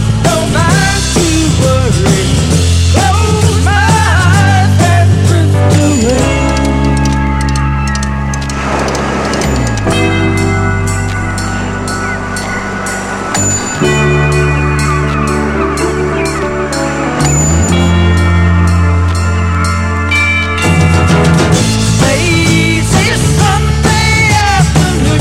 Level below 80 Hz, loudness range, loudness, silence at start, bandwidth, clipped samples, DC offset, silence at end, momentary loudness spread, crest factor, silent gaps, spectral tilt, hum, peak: -22 dBFS; 4 LU; -10 LUFS; 0 s; 14.5 kHz; under 0.1%; under 0.1%; 0 s; 6 LU; 10 dB; none; -5 dB/octave; none; 0 dBFS